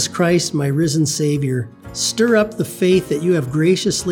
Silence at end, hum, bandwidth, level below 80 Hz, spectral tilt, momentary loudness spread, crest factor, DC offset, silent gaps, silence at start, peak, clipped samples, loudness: 0 s; none; 18 kHz; -50 dBFS; -5 dB/octave; 6 LU; 14 dB; under 0.1%; none; 0 s; -2 dBFS; under 0.1%; -17 LUFS